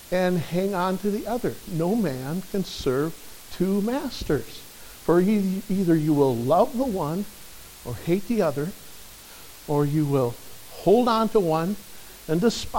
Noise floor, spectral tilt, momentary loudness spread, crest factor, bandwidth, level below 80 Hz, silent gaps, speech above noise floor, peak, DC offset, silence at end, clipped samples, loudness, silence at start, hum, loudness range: -44 dBFS; -6.5 dB/octave; 20 LU; 18 dB; 17 kHz; -48 dBFS; none; 21 dB; -6 dBFS; under 0.1%; 0 s; under 0.1%; -24 LUFS; 0 s; none; 4 LU